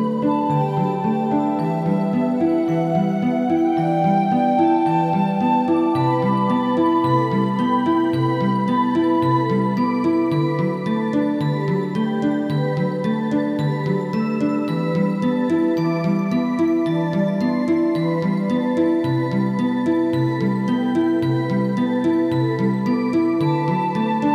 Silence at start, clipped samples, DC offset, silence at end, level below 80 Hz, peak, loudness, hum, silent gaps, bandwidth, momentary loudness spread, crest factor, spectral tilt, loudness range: 0 s; under 0.1%; under 0.1%; 0 s; -66 dBFS; -6 dBFS; -20 LUFS; none; none; 9.6 kHz; 3 LU; 12 dB; -8.5 dB/octave; 3 LU